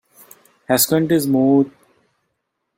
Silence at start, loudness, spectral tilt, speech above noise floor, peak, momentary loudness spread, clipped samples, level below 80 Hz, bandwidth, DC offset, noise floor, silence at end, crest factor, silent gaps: 0.7 s; -16 LUFS; -4.5 dB/octave; 59 dB; -2 dBFS; 5 LU; under 0.1%; -60 dBFS; 16.5 kHz; under 0.1%; -74 dBFS; 1.1 s; 18 dB; none